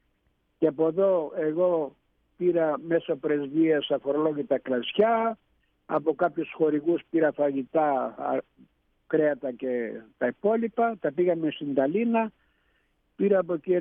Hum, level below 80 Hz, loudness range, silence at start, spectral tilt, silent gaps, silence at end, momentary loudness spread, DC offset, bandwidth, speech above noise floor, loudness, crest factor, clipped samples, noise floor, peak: none; -72 dBFS; 2 LU; 0.6 s; -10 dB/octave; none; 0 s; 7 LU; under 0.1%; 3.7 kHz; 46 dB; -26 LUFS; 16 dB; under 0.1%; -71 dBFS; -10 dBFS